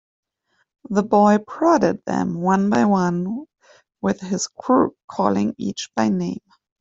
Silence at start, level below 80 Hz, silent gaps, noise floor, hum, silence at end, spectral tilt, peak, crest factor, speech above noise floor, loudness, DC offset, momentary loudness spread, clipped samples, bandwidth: 0.9 s; -58 dBFS; 5.04-5.08 s; -69 dBFS; none; 0.45 s; -6 dB/octave; -2 dBFS; 18 dB; 49 dB; -20 LUFS; under 0.1%; 10 LU; under 0.1%; 7.8 kHz